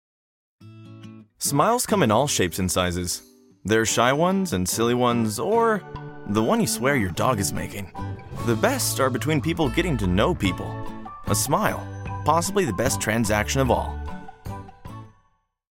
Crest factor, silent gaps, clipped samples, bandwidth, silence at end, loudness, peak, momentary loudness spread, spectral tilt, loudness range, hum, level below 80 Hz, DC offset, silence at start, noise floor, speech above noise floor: 20 dB; none; under 0.1%; 17 kHz; 0.65 s; -23 LUFS; -4 dBFS; 17 LU; -4.5 dB/octave; 2 LU; none; -42 dBFS; under 0.1%; 0.6 s; -66 dBFS; 44 dB